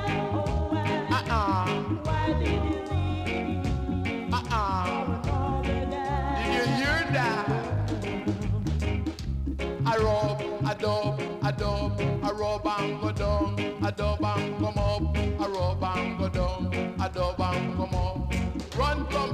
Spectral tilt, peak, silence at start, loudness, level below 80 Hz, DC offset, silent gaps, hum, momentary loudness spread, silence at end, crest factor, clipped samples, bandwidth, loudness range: -6.5 dB/octave; -12 dBFS; 0 s; -28 LUFS; -36 dBFS; under 0.1%; none; none; 4 LU; 0 s; 14 dB; under 0.1%; 13.5 kHz; 1 LU